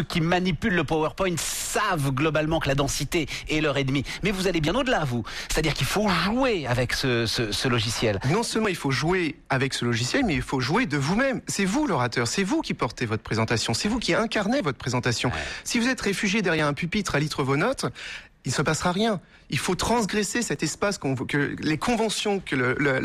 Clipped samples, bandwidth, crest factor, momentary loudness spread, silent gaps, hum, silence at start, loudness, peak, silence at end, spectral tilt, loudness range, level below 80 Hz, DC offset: under 0.1%; 15 kHz; 14 dB; 4 LU; none; none; 0 s; -25 LUFS; -12 dBFS; 0 s; -4.5 dB/octave; 2 LU; -42 dBFS; under 0.1%